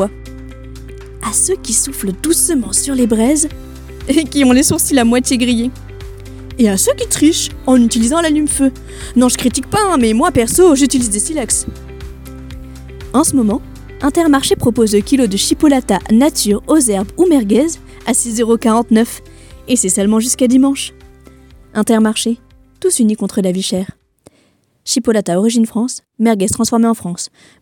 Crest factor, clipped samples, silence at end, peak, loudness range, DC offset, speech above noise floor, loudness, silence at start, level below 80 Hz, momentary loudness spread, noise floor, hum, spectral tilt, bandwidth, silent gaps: 14 dB; under 0.1%; 0.35 s; 0 dBFS; 4 LU; under 0.1%; 43 dB; -13 LUFS; 0 s; -34 dBFS; 20 LU; -56 dBFS; none; -4 dB/octave; 17.5 kHz; none